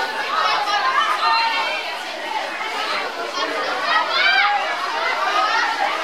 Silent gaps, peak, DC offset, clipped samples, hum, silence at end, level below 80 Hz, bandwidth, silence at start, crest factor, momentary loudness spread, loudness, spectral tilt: none; -4 dBFS; 0.3%; under 0.1%; none; 0 s; -72 dBFS; 16.5 kHz; 0 s; 16 dB; 9 LU; -19 LUFS; 0 dB/octave